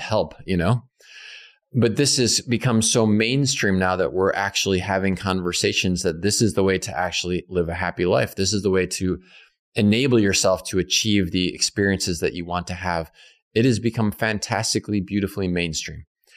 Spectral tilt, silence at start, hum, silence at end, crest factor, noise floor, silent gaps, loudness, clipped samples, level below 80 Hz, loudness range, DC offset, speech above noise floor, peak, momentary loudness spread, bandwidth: -4 dB/octave; 0 s; none; 0.35 s; 14 dB; -44 dBFS; 9.59-9.72 s, 13.42-13.51 s; -21 LUFS; under 0.1%; -48 dBFS; 4 LU; under 0.1%; 23 dB; -8 dBFS; 8 LU; 15.5 kHz